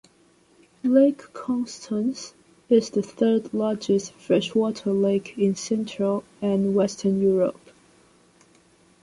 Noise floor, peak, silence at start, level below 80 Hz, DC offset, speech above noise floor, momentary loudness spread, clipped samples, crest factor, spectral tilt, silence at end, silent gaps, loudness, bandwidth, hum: -59 dBFS; -6 dBFS; 0.85 s; -66 dBFS; under 0.1%; 36 dB; 8 LU; under 0.1%; 18 dB; -6.5 dB/octave; 1.5 s; none; -24 LUFS; 11.5 kHz; none